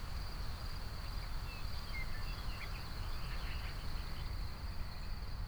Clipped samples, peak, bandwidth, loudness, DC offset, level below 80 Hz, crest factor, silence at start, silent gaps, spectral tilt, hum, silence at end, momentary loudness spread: under 0.1%; -28 dBFS; over 20 kHz; -45 LUFS; under 0.1%; -42 dBFS; 12 dB; 0 s; none; -4.5 dB/octave; none; 0 s; 2 LU